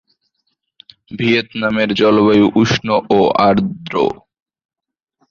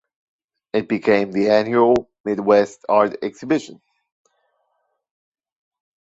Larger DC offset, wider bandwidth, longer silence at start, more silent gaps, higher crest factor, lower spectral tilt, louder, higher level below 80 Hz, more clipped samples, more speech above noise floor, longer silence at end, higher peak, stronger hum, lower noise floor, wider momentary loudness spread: neither; about the same, 7.4 kHz vs 8 kHz; first, 1.1 s vs 0.75 s; second, none vs 2.20-2.24 s; about the same, 14 dB vs 18 dB; about the same, -6 dB/octave vs -6 dB/octave; first, -14 LUFS vs -19 LUFS; first, -48 dBFS vs -58 dBFS; neither; about the same, 56 dB vs 53 dB; second, 1.15 s vs 2.3 s; about the same, -2 dBFS vs -2 dBFS; neither; about the same, -70 dBFS vs -71 dBFS; about the same, 9 LU vs 9 LU